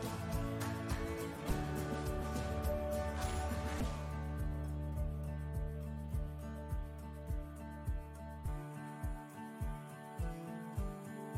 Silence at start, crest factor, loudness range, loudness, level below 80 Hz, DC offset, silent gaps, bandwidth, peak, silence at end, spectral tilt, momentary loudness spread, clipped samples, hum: 0 s; 16 dB; 6 LU; -42 LUFS; -44 dBFS; under 0.1%; none; 16 kHz; -24 dBFS; 0 s; -6.5 dB/octave; 7 LU; under 0.1%; none